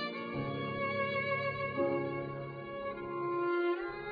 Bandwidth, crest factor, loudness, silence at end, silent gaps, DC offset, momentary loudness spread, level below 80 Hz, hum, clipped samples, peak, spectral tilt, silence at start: 5 kHz; 14 dB; -35 LUFS; 0 s; none; under 0.1%; 8 LU; -64 dBFS; none; under 0.1%; -22 dBFS; -4.5 dB/octave; 0 s